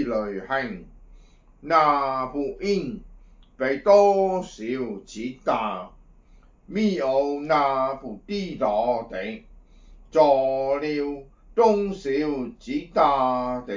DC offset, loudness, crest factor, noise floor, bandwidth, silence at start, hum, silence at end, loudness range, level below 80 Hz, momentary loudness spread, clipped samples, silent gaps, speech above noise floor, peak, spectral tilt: under 0.1%; -23 LUFS; 20 dB; -53 dBFS; 7.6 kHz; 0 s; none; 0 s; 3 LU; -50 dBFS; 15 LU; under 0.1%; none; 30 dB; -4 dBFS; -6 dB/octave